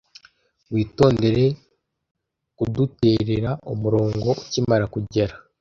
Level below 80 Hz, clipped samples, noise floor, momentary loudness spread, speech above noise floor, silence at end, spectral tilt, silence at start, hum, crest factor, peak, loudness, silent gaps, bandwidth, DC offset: -46 dBFS; under 0.1%; -57 dBFS; 8 LU; 37 dB; 0.25 s; -7.5 dB/octave; 0.7 s; none; 20 dB; -2 dBFS; -22 LUFS; 2.11-2.15 s; 7.4 kHz; under 0.1%